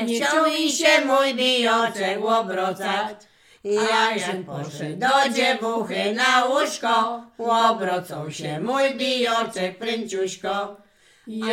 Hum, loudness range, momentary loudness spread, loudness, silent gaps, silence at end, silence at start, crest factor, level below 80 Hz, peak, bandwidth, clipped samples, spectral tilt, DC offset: none; 4 LU; 12 LU; -21 LUFS; none; 0 s; 0 s; 18 dB; -72 dBFS; -4 dBFS; 16.5 kHz; under 0.1%; -3 dB/octave; under 0.1%